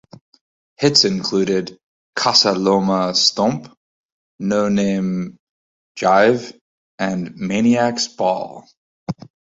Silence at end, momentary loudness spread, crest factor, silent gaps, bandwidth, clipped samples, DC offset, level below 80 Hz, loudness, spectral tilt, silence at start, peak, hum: 0.45 s; 17 LU; 18 dB; 1.83-2.13 s, 3.77-4.39 s, 5.40-5.95 s, 6.61-6.98 s, 8.77-9.07 s; 8 kHz; under 0.1%; under 0.1%; -56 dBFS; -17 LUFS; -4 dB/octave; 0.8 s; 0 dBFS; none